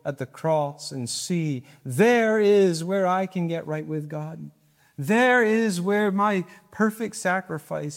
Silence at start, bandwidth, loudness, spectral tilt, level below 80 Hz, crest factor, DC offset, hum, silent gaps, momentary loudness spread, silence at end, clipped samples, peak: 0.05 s; 16.5 kHz; -23 LUFS; -5.5 dB/octave; -72 dBFS; 16 dB; under 0.1%; none; none; 14 LU; 0 s; under 0.1%; -8 dBFS